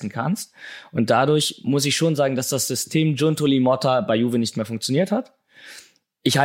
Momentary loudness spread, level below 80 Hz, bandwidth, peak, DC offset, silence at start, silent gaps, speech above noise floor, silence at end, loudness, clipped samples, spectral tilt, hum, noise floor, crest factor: 10 LU; -66 dBFS; 16.5 kHz; -2 dBFS; under 0.1%; 0 s; none; 28 dB; 0 s; -21 LUFS; under 0.1%; -4.5 dB/octave; none; -49 dBFS; 18 dB